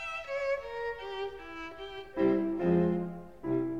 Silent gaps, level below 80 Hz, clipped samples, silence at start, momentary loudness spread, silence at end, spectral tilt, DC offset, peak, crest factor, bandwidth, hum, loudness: none; -60 dBFS; under 0.1%; 0 s; 14 LU; 0 s; -8 dB/octave; 0.2%; -16 dBFS; 16 dB; 7.6 kHz; none; -33 LUFS